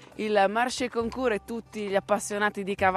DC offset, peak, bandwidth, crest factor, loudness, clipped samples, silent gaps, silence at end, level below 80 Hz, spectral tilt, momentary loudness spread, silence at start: under 0.1%; -8 dBFS; 13.5 kHz; 18 dB; -27 LUFS; under 0.1%; none; 0 s; -56 dBFS; -4 dB/octave; 7 LU; 0 s